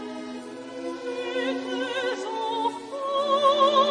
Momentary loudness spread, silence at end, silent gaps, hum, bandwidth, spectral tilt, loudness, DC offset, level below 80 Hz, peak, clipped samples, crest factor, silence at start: 16 LU; 0 s; none; none; 10.5 kHz; -3 dB/octave; -26 LUFS; under 0.1%; -76 dBFS; -8 dBFS; under 0.1%; 18 dB; 0 s